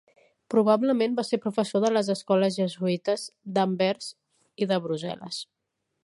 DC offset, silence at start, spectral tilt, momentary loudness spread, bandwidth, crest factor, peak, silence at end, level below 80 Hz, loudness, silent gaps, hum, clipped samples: under 0.1%; 0.5 s; -5.5 dB/octave; 12 LU; 11.5 kHz; 18 dB; -8 dBFS; 0.6 s; -76 dBFS; -26 LUFS; none; none; under 0.1%